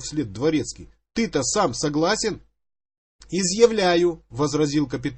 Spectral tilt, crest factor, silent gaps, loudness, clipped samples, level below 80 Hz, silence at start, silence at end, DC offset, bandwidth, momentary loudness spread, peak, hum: -4 dB/octave; 20 dB; 2.98-3.19 s; -22 LUFS; under 0.1%; -50 dBFS; 0 s; 0 s; under 0.1%; 8.8 kHz; 12 LU; -2 dBFS; none